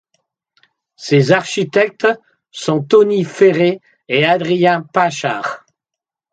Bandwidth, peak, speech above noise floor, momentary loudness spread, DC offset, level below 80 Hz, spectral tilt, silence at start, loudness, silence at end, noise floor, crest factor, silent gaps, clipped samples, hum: 9.2 kHz; 0 dBFS; 70 dB; 13 LU; under 0.1%; -64 dBFS; -5.5 dB/octave; 1 s; -15 LUFS; 0.75 s; -84 dBFS; 16 dB; none; under 0.1%; none